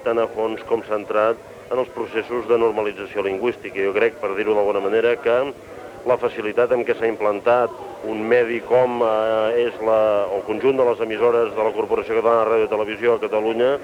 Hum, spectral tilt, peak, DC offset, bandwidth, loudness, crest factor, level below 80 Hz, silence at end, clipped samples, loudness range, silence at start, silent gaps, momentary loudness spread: none; -6 dB/octave; -4 dBFS; under 0.1%; 11 kHz; -20 LUFS; 14 dB; -58 dBFS; 0 s; under 0.1%; 3 LU; 0 s; none; 7 LU